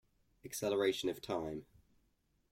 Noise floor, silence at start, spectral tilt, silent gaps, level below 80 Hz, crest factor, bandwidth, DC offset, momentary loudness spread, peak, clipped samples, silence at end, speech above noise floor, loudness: -77 dBFS; 0.45 s; -4 dB/octave; none; -70 dBFS; 18 dB; 16.5 kHz; under 0.1%; 14 LU; -22 dBFS; under 0.1%; 0.9 s; 40 dB; -38 LUFS